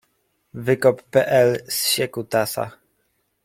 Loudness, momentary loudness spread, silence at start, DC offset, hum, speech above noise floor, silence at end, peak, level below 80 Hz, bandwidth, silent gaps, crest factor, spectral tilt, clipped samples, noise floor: -20 LUFS; 12 LU; 0.55 s; under 0.1%; none; 50 dB; 0.75 s; -4 dBFS; -62 dBFS; 16.5 kHz; none; 18 dB; -3.5 dB/octave; under 0.1%; -69 dBFS